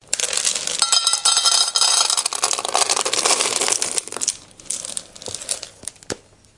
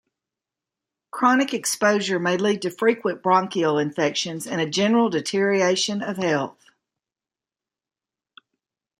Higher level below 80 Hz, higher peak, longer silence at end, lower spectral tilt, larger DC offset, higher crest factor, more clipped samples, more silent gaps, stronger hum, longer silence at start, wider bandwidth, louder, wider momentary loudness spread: first, -60 dBFS vs -72 dBFS; first, 0 dBFS vs -4 dBFS; second, 0.4 s vs 2.5 s; second, 1.5 dB/octave vs -4 dB/octave; neither; about the same, 22 dB vs 20 dB; neither; neither; neither; second, 0.1 s vs 1.15 s; second, 12 kHz vs 15.5 kHz; first, -17 LUFS vs -22 LUFS; first, 17 LU vs 6 LU